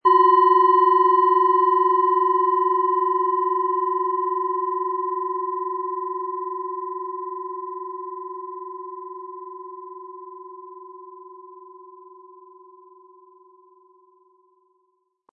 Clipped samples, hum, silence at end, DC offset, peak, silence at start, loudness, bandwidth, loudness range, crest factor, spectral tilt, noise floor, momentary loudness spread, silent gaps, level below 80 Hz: under 0.1%; none; 3.3 s; under 0.1%; -6 dBFS; 0.05 s; -20 LUFS; 4.5 kHz; 23 LU; 16 dB; -7 dB/octave; -70 dBFS; 24 LU; none; under -90 dBFS